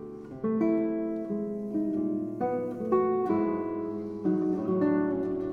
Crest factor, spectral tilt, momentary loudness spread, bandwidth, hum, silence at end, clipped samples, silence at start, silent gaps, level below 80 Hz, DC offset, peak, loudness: 16 dB; -10.5 dB/octave; 7 LU; 4.6 kHz; none; 0 s; under 0.1%; 0 s; none; -62 dBFS; under 0.1%; -14 dBFS; -29 LUFS